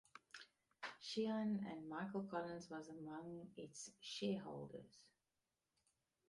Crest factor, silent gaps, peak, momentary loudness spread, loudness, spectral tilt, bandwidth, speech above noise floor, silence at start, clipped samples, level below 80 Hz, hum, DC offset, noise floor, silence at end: 18 dB; none; -32 dBFS; 16 LU; -48 LUFS; -5 dB/octave; 11.5 kHz; over 43 dB; 0.15 s; under 0.1%; -86 dBFS; none; under 0.1%; under -90 dBFS; 1.2 s